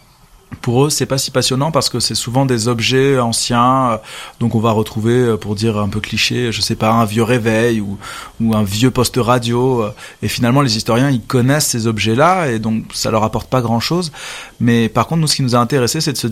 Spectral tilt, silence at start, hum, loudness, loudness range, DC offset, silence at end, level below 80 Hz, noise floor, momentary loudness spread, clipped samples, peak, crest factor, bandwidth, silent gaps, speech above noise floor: -5 dB/octave; 0.5 s; none; -15 LUFS; 2 LU; under 0.1%; 0 s; -42 dBFS; -46 dBFS; 7 LU; under 0.1%; 0 dBFS; 14 dB; 16 kHz; none; 31 dB